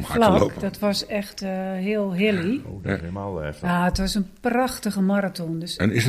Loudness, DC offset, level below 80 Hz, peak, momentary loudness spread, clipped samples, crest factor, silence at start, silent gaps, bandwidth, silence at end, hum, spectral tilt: -24 LUFS; under 0.1%; -40 dBFS; -4 dBFS; 8 LU; under 0.1%; 20 dB; 0 s; none; 15.5 kHz; 0 s; none; -5.5 dB/octave